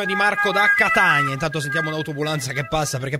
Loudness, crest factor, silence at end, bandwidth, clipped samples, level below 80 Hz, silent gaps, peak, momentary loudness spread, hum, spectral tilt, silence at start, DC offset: -19 LUFS; 18 dB; 0 s; 16 kHz; under 0.1%; -48 dBFS; none; -4 dBFS; 9 LU; none; -4 dB/octave; 0 s; under 0.1%